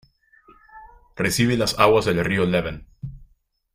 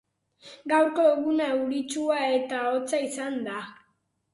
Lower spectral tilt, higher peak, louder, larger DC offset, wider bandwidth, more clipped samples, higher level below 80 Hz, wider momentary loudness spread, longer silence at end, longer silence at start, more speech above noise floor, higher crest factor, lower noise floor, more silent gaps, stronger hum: first, -5 dB/octave vs -3 dB/octave; first, -2 dBFS vs -10 dBFS; first, -20 LUFS vs -26 LUFS; neither; first, 16 kHz vs 11.5 kHz; neither; first, -46 dBFS vs -76 dBFS; first, 21 LU vs 12 LU; about the same, 0.5 s vs 0.6 s; first, 0.75 s vs 0.45 s; second, 40 dB vs 46 dB; first, 22 dB vs 16 dB; second, -60 dBFS vs -72 dBFS; neither; neither